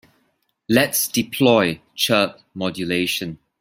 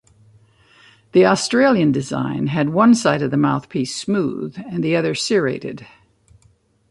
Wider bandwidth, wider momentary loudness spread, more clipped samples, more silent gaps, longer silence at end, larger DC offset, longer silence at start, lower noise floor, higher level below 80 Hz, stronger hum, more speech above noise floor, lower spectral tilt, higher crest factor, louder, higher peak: first, 16.5 kHz vs 11.5 kHz; about the same, 10 LU vs 10 LU; neither; neither; second, 0.25 s vs 1.05 s; neither; second, 0.7 s vs 1.15 s; first, -68 dBFS vs -57 dBFS; about the same, -58 dBFS vs -58 dBFS; neither; first, 48 dB vs 40 dB; second, -3.5 dB/octave vs -5.5 dB/octave; about the same, 20 dB vs 16 dB; about the same, -19 LUFS vs -18 LUFS; about the same, -2 dBFS vs -2 dBFS